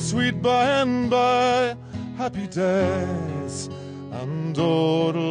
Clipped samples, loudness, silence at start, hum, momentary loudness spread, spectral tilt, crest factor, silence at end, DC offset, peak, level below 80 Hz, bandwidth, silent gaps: under 0.1%; -23 LUFS; 0 s; none; 13 LU; -5.5 dB/octave; 14 dB; 0 s; under 0.1%; -10 dBFS; -48 dBFS; 10.5 kHz; none